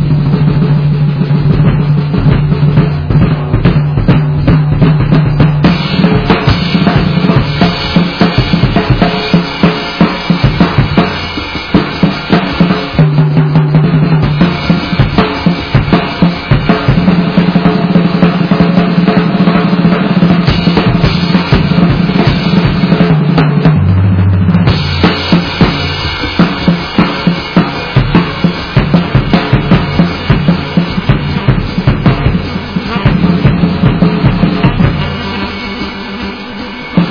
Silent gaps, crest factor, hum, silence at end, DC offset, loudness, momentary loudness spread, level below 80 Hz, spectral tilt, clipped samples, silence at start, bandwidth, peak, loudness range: none; 8 dB; none; 0 s; 0.5%; -10 LUFS; 4 LU; -24 dBFS; -8.5 dB/octave; 1%; 0 s; 5.4 kHz; 0 dBFS; 2 LU